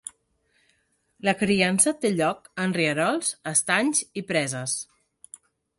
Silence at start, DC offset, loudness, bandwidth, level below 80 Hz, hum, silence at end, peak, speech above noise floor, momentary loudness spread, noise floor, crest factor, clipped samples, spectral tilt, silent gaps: 0.05 s; under 0.1%; -24 LUFS; 12 kHz; -64 dBFS; none; 0.95 s; -4 dBFS; 44 dB; 9 LU; -69 dBFS; 22 dB; under 0.1%; -3 dB/octave; none